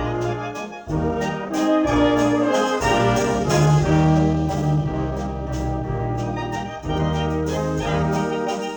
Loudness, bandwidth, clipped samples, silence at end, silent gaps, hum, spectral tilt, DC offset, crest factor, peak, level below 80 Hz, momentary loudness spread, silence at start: -21 LUFS; over 20 kHz; under 0.1%; 0 s; none; none; -6.5 dB/octave; under 0.1%; 14 dB; -6 dBFS; -34 dBFS; 9 LU; 0 s